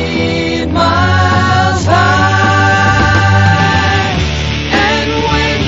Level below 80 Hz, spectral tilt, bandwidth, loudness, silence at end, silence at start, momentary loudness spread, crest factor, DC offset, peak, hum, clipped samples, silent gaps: -26 dBFS; -5 dB/octave; 7.8 kHz; -10 LUFS; 0 s; 0 s; 5 LU; 10 dB; 0.2%; 0 dBFS; none; under 0.1%; none